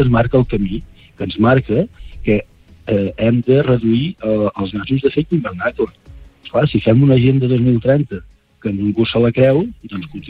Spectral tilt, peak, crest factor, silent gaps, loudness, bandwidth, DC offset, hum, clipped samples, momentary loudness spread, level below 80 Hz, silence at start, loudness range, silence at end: -10 dB/octave; -2 dBFS; 14 dB; none; -16 LUFS; 4.8 kHz; under 0.1%; none; under 0.1%; 12 LU; -36 dBFS; 0 s; 3 LU; 0 s